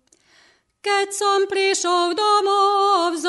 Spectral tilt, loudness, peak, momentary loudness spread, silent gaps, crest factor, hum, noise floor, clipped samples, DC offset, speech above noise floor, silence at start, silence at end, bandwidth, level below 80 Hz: 0 dB/octave; -18 LUFS; -6 dBFS; 5 LU; none; 14 dB; none; -57 dBFS; under 0.1%; under 0.1%; 38 dB; 0.85 s; 0 s; 11.5 kHz; -76 dBFS